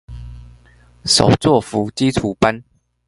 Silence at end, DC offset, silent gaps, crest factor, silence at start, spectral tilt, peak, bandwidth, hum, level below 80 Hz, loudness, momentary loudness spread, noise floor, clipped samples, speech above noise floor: 0.45 s; under 0.1%; none; 18 dB; 0.1 s; -4.5 dB/octave; 0 dBFS; 11.5 kHz; 60 Hz at -40 dBFS; -38 dBFS; -16 LUFS; 19 LU; -48 dBFS; under 0.1%; 33 dB